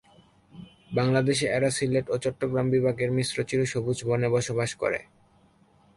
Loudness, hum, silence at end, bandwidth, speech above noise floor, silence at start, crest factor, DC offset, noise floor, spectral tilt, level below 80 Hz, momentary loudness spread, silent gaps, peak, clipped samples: -26 LUFS; none; 0.95 s; 11.5 kHz; 35 dB; 0.55 s; 16 dB; under 0.1%; -61 dBFS; -5.5 dB/octave; -58 dBFS; 6 LU; none; -10 dBFS; under 0.1%